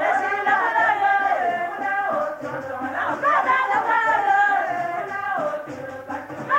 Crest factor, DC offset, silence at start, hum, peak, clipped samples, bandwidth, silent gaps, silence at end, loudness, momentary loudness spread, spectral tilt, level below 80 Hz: 14 dB; under 0.1%; 0 s; none; -8 dBFS; under 0.1%; 16 kHz; none; 0 s; -21 LUFS; 13 LU; -4.5 dB/octave; -68 dBFS